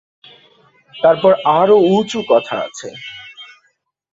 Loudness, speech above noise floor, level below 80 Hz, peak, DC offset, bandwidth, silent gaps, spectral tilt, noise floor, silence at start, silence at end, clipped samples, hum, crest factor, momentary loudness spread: -14 LUFS; 49 dB; -60 dBFS; -2 dBFS; under 0.1%; 7.8 kHz; none; -5.5 dB/octave; -63 dBFS; 0.95 s; 0.7 s; under 0.1%; none; 16 dB; 20 LU